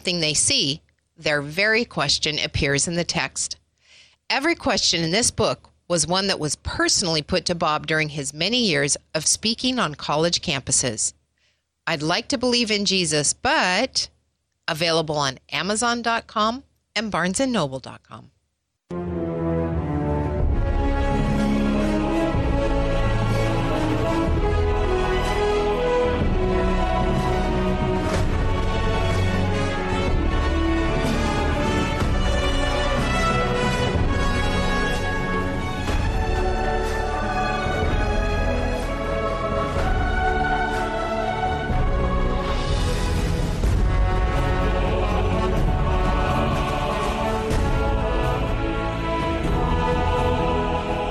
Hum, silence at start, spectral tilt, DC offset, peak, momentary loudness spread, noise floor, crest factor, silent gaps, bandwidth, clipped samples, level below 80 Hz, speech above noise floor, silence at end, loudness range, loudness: none; 0.05 s; -4 dB/octave; under 0.1%; -6 dBFS; 6 LU; -75 dBFS; 16 dB; none; 14 kHz; under 0.1%; -28 dBFS; 53 dB; 0 s; 3 LU; -22 LUFS